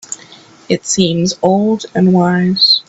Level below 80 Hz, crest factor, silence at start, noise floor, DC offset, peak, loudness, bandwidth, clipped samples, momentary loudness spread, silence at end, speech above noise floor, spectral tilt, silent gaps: -52 dBFS; 14 dB; 0.1 s; -40 dBFS; under 0.1%; 0 dBFS; -13 LUFS; 8 kHz; under 0.1%; 9 LU; 0.05 s; 28 dB; -4.5 dB/octave; none